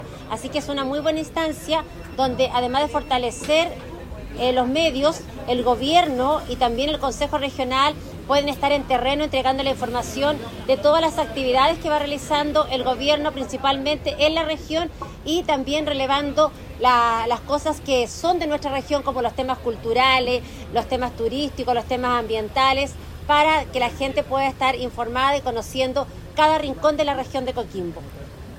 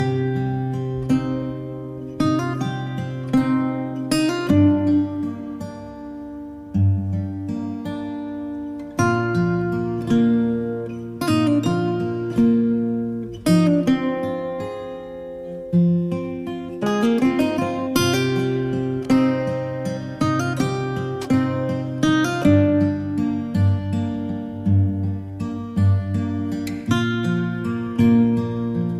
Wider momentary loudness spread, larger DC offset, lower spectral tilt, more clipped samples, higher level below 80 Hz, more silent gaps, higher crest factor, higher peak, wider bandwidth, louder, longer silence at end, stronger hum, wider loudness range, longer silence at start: second, 8 LU vs 12 LU; neither; second, -4 dB/octave vs -7 dB/octave; neither; first, -40 dBFS vs -48 dBFS; neither; about the same, 18 dB vs 16 dB; about the same, -4 dBFS vs -4 dBFS; about the same, 16 kHz vs 15.5 kHz; about the same, -21 LUFS vs -21 LUFS; about the same, 0 s vs 0 s; neither; about the same, 2 LU vs 4 LU; about the same, 0 s vs 0 s